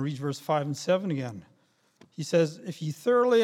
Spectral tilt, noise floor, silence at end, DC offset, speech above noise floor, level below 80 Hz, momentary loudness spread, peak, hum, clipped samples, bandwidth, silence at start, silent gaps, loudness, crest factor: -6 dB/octave; -67 dBFS; 0 s; under 0.1%; 40 dB; -76 dBFS; 14 LU; -12 dBFS; none; under 0.1%; 15 kHz; 0 s; none; -28 LUFS; 16 dB